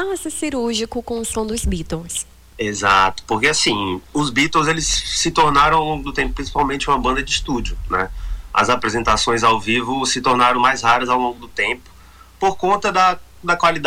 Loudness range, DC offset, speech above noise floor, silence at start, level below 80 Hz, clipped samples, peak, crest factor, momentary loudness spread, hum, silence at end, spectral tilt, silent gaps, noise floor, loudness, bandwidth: 3 LU; under 0.1%; 26 dB; 0 s; -34 dBFS; under 0.1%; -4 dBFS; 16 dB; 10 LU; none; 0 s; -3 dB/octave; none; -44 dBFS; -18 LUFS; 19 kHz